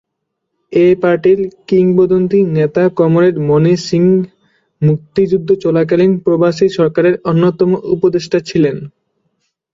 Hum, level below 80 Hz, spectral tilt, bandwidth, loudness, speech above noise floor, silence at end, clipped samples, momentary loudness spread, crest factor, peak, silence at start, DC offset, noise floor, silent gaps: none; -52 dBFS; -8 dB/octave; 7.6 kHz; -12 LUFS; 62 dB; 0.85 s; under 0.1%; 5 LU; 12 dB; -2 dBFS; 0.7 s; under 0.1%; -73 dBFS; none